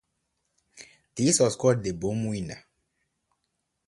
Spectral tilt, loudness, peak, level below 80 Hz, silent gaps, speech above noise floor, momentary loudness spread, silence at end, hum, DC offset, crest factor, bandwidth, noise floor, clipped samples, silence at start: -4.5 dB/octave; -25 LUFS; -8 dBFS; -56 dBFS; none; 54 dB; 18 LU; 1.3 s; none; under 0.1%; 20 dB; 11.5 kHz; -79 dBFS; under 0.1%; 0.75 s